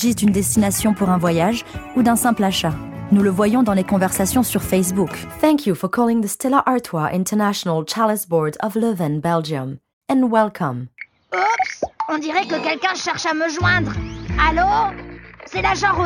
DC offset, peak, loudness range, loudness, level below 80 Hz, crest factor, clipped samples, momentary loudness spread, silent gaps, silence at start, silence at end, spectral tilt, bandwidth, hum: under 0.1%; 0 dBFS; 3 LU; -19 LUFS; -38 dBFS; 18 dB; under 0.1%; 9 LU; 9.93-10.01 s; 0 s; 0 s; -5 dB/octave; 17.5 kHz; none